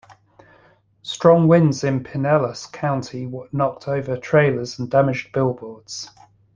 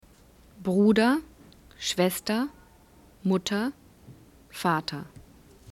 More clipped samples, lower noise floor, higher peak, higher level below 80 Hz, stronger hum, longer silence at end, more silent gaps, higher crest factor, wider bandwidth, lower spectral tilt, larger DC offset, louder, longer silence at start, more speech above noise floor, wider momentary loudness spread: neither; about the same, -55 dBFS vs -55 dBFS; first, -2 dBFS vs -10 dBFS; about the same, -54 dBFS vs -58 dBFS; neither; about the same, 0.45 s vs 0.5 s; neither; about the same, 18 dB vs 18 dB; second, 9.2 kHz vs 16 kHz; first, -6.5 dB/octave vs -5 dB/octave; neither; first, -20 LUFS vs -27 LUFS; first, 1.05 s vs 0.6 s; first, 36 dB vs 30 dB; first, 17 LU vs 14 LU